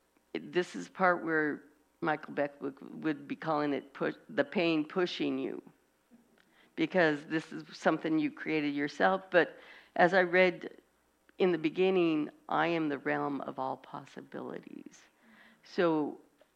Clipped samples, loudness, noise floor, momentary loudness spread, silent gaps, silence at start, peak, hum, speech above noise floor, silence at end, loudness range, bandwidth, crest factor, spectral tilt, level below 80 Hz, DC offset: under 0.1%; -32 LUFS; -70 dBFS; 16 LU; none; 0.35 s; -10 dBFS; none; 39 dB; 0.4 s; 6 LU; 9.6 kHz; 22 dB; -6 dB/octave; -78 dBFS; under 0.1%